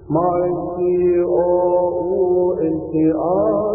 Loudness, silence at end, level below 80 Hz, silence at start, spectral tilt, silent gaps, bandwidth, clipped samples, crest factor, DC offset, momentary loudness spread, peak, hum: -18 LUFS; 0 s; -46 dBFS; 0 s; -16 dB/octave; none; 2.7 kHz; under 0.1%; 10 dB; under 0.1%; 4 LU; -6 dBFS; none